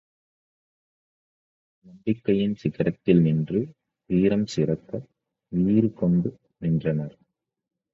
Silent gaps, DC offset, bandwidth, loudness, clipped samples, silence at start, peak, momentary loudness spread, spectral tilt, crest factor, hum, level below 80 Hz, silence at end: none; under 0.1%; 7.6 kHz; -24 LUFS; under 0.1%; 1.95 s; -6 dBFS; 12 LU; -8.5 dB/octave; 20 dB; none; -54 dBFS; 0.85 s